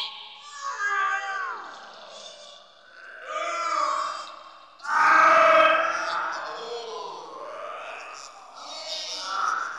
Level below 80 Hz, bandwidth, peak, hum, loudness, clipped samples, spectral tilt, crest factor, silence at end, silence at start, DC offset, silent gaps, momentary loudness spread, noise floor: -76 dBFS; 11.5 kHz; -6 dBFS; none; -23 LUFS; under 0.1%; -0.5 dB/octave; 20 dB; 0 s; 0 s; under 0.1%; none; 25 LU; -50 dBFS